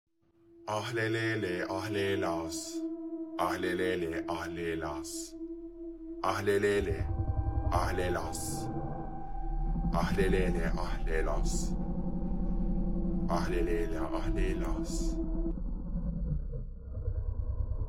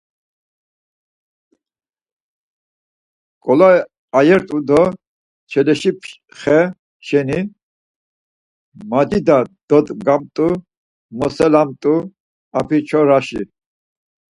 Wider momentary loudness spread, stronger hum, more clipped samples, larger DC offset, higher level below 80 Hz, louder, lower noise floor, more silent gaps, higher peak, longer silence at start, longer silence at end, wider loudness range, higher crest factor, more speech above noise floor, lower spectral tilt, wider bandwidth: second, 10 LU vs 15 LU; neither; neither; first, 0.1% vs under 0.1%; first, -36 dBFS vs -52 dBFS; second, -34 LUFS vs -16 LUFS; second, -63 dBFS vs under -90 dBFS; second, none vs 3.98-4.08 s, 5.07-5.47 s, 6.79-7.00 s, 7.63-8.72 s, 9.63-9.68 s, 10.77-11.09 s, 12.20-12.51 s; second, -14 dBFS vs 0 dBFS; second, 0.3 s vs 3.45 s; second, 0 s vs 0.95 s; about the same, 3 LU vs 4 LU; about the same, 18 dB vs 18 dB; second, 32 dB vs over 75 dB; second, -5.5 dB/octave vs -7 dB/octave; first, 15.5 kHz vs 11.5 kHz